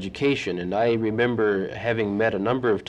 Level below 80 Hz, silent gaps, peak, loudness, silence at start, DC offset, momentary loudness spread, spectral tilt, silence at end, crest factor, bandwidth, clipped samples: -54 dBFS; none; -10 dBFS; -24 LUFS; 0 s; under 0.1%; 4 LU; -6.5 dB/octave; 0 s; 14 dB; 9.2 kHz; under 0.1%